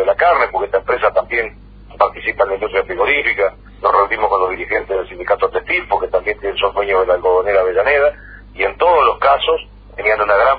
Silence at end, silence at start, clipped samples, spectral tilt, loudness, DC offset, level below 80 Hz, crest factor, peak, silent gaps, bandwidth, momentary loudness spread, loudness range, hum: 0 s; 0 s; under 0.1%; -7 dB/octave; -15 LUFS; under 0.1%; -40 dBFS; 16 dB; 0 dBFS; none; 5 kHz; 7 LU; 2 LU; 50 Hz at -40 dBFS